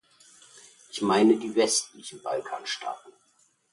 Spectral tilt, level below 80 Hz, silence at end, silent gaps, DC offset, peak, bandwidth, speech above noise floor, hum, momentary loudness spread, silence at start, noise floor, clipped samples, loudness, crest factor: -3 dB/octave; -74 dBFS; 0.65 s; none; under 0.1%; -10 dBFS; 11.5 kHz; 30 dB; none; 18 LU; 0.95 s; -56 dBFS; under 0.1%; -26 LUFS; 18 dB